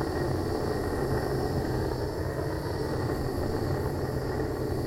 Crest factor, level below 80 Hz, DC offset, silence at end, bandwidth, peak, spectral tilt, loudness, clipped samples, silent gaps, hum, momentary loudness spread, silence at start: 14 dB; -40 dBFS; under 0.1%; 0 s; 16 kHz; -16 dBFS; -7 dB/octave; -30 LUFS; under 0.1%; none; none; 2 LU; 0 s